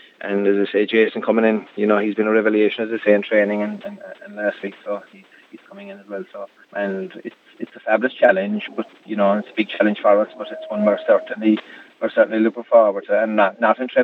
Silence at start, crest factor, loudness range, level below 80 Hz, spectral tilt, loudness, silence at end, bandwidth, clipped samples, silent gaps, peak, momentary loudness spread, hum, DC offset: 0.2 s; 20 dB; 11 LU; -88 dBFS; -8 dB/octave; -19 LUFS; 0 s; 5.6 kHz; under 0.1%; none; 0 dBFS; 17 LU; none; under 0.1%